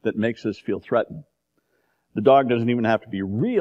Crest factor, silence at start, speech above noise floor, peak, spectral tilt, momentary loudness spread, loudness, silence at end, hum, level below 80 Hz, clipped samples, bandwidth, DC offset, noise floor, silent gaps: 20 dB; 0.05 s; 49 dB; -4 dBFS; -8.5 dB/octave; 14 LU; -22 LUFS; 0 s; none; -64 dBFS; under 0.1%; 7.4 kHz; under 0.1%; -70 dBFS; none